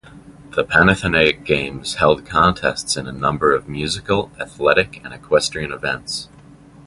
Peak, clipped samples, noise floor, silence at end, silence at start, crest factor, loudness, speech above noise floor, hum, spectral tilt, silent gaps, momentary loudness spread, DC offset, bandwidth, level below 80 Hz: 0 dBFS; under 0.1%; -44 dBFS; 0.6 s; 0.05 s; 18 dB; -18 LUFS; 25 dB; none; -4 dB/octave; none; 11 LU; under 0.1%; 11.5 kHz; -40 dBFS